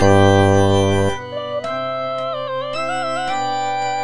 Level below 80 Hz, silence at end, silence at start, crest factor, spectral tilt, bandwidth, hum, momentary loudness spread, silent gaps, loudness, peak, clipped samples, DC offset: -44 dBFS; 0 s; 0 s; 16 dB; -6 dB/octave; 10 kHz; none; 11 LU; none; -18 LUFS; -2 dBFS; under 0.1%; under 0.1%